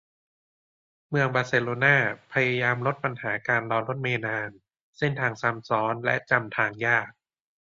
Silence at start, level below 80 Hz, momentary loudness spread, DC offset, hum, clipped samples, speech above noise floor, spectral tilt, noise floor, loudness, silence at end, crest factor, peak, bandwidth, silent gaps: 1.1 s; -66 dBFS; 8 LU; under 0.1%; none; under 0.1%; over 64 dB; -6.5 dB/octave; under -90 dBFS; -25 LUFS; 0.65 s; 22 dB; -6 dBFS; 7.6 kHz; 4.81-4.93 s